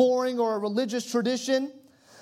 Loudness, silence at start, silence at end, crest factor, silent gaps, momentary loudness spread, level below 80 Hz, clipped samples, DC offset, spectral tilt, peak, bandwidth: -27 LUFS; 0 s; 0.45 s; 18 dB; none; 3 LU; -84 dBFS; under 0.1%; under 0.1%; -4 dB/octave; -10 dBFS; 14.5 kHz